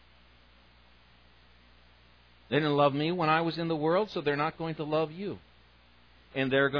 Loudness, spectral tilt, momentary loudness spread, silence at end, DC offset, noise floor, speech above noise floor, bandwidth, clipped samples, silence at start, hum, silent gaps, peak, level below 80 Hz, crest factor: -29 LUFS; -8 dB/octave; 12 LU; 0 s; under 0.1%; -60 dBFS; 32 dB; 5.4 kHz; under 0.1%; 2.5 s; 60 Hz at -60 dBFS; none; -10 dBFS; -64 dBFS; 20 dB